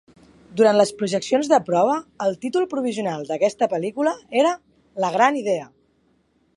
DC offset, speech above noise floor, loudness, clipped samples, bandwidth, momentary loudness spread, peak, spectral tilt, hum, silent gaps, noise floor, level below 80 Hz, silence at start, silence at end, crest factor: under 0.1%; 43 dB; -21 LUFS; under 0.1%; 11.5 kHz; 9 LU; -2 dBFS; -5 dB/octave; none; none; -63 dBFS; -68 dBFS; 0.5 s; 0.9 s; 20 dB